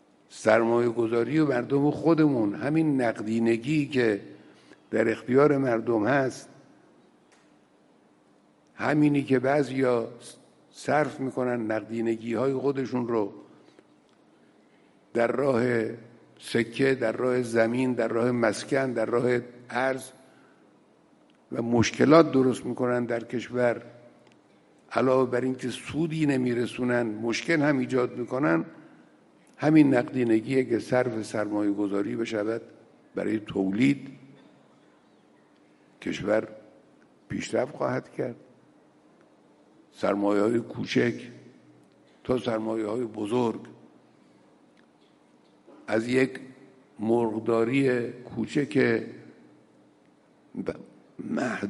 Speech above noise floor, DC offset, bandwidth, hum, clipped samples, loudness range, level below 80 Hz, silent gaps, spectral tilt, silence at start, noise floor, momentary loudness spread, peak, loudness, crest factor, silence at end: 36 dB; under 0.1%; 11.5 kHz; none; under 0.1%; 7 LU; -68 dBFS; none; -6.5 dB/octave; 0.3 s; -61 dBFS; 12 LU; -4 dBFS; -26 LUFS; 24 dB; 0 s